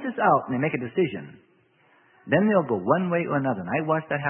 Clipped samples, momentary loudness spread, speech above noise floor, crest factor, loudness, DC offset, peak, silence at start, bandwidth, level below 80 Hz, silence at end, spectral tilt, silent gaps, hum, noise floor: under 0.1%; 5 LU; 37 dB; 18 dB; -24 LUFS; under 0.1%; -6 dBFS; 0 s; 3.5 kHz; -66 dBFS; 0 s; -11.5 dB/octave; none; none; -61 dBFS